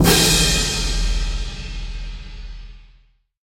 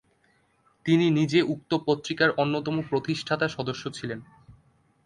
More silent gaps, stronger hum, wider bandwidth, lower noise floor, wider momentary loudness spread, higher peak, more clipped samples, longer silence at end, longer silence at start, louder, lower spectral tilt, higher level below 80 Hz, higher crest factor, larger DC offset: neither; neither; first, 16.5 kHz vs 11 kHz; second, -55 dBFS vs -66 dBFS; first, 24 LU vs 12 LU; first, 0 dBFS vs -8 dBFS; neither; about the same, 0.65 s vs 0.55 s; second, 0 s vs 0.85 s; first, -18 LUFS vs -26 LUFS; second, -3 dB/octave vs -6 dB/octave; first, -26 dBFS vs -62 dBFS; about the same, 20 dB vs 20 dB; neither